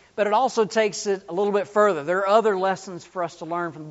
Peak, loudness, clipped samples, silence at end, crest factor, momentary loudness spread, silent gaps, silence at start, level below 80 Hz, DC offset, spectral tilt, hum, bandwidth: -4 dBFS; -23 LUFS; under 0.1%; 0 s; 18 dB; 11 LU; none; 0.15 s; -70 dBFS; under 0.1%; -3.5 dB/octave; none; 8 kHz